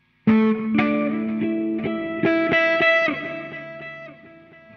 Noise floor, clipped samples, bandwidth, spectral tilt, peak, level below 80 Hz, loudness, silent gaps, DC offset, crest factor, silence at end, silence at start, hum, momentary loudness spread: -47 dBFS; under 0.1%; 6.2 kHz; -7 dB/octave; -6 dBFS; -58 dBFS; -20 LUFS; none; under 0.1%; 16 dB; 0.45 s; 0.25 s; none; 18 LU